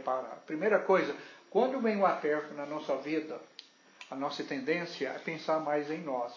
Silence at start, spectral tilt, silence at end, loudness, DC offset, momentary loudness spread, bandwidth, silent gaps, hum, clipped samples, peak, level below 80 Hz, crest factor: 0 s; -6 dB/octave; 0 s; -32 LUFS; under 0.1%; 15 LU; 7.4 kHz; none; none; under 0.1%; -14 dBFS; under -90 dBFS; 18 dB